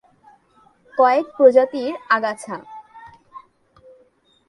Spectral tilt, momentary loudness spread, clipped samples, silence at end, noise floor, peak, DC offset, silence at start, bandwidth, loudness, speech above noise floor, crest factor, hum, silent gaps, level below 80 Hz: -4.5 dB/octave; 20 LU; under 0.1%; 1.1 s; -58 dBFS; -2 dBFS; under 0.1%; 0.95 s; 11.5 kHz; -18 LUFS; 41 dB; 20 dB; none; none; -70 dBFS